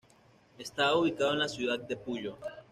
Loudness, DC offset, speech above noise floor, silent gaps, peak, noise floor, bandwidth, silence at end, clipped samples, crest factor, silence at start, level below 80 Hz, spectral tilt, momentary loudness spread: -31 LUFS; under 0.1%; 31 dB; none; -16 dBFS; -62 dBFS; 13.5 kHz; 0.1 s; under 0.1%; 16 dB; 0.6 s; -68 dBFS; -4 dB/octave; 14 LU